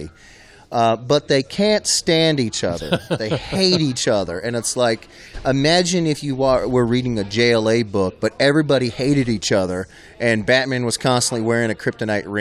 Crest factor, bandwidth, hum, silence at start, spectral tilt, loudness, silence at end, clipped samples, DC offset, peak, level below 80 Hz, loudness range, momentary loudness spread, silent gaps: 18 dB; 14.5 kHz; none; 0 s; -4.5 dB/octave; -18 LUFS; 0 s; under 0.1%; under 0.1%; -2 dBFS; -44 dBFS; 1 LU; 7 LU; none